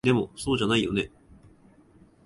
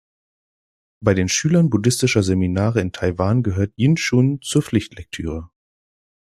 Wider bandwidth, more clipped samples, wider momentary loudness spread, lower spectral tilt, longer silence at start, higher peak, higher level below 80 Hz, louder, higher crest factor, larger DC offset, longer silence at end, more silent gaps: second, 11.5 kHz vs 14 kHz; neither; second, 7 LU vs 11 LU; about the same, -5.5 dB/octave vs -5.5 dB/octave; second, 0.05 s vs 1 s; second, -10 dBFS vs -2 dBFS; second, -52 dBFS vs -46 dBFS; second, -26 LUFS vs -19 LUFS; about the same, 18 dB vs 18 dB; neither; first, 1.2 s vs 0.9 s; neither